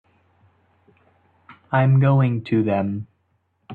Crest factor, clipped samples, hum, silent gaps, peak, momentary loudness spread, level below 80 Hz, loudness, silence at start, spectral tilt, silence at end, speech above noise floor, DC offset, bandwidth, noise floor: 16 dB; under 0.1%; none; none; -6 dBFS; 13 LU; -60 dBFS; -20 LUFS; 1.5 s; -11 dB/octave; 0 s; 50 dB; under 0.1%; 4.4 kHz; -68 dBFS